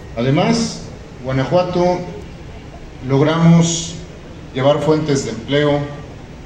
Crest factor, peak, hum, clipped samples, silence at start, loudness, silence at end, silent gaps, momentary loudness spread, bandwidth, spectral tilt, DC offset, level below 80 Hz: 16 dB; -2 dBFS; none; under 0.1%; 0 s; -16 LUFS; 0 s; none; 22 LU; 9.4 kHz; -6 dB/octave; under 0.1%; -40 dBFS